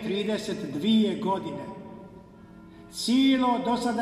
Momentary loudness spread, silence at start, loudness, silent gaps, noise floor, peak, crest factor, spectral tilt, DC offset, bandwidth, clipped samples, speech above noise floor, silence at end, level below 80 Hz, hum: 18 LU; 0 s; -26 LUFS; none; -48 dBFS; -12 dBFS; 14 dB; -5 dB/octave; under 0.1%; 14 kHz; under 0.1%; 23 dB; 0 s; -60 dBFS; none